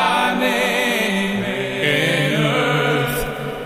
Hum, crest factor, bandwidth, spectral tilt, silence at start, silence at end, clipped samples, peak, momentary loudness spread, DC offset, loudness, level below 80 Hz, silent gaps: none; 16 dB; 15.5 kHz; -4.5 dB/octave; 0 s; 0 s; under 0.1%; -2 dBFS; 5 LU; under 0.1%; -18 LUFS; -44 dBFS; none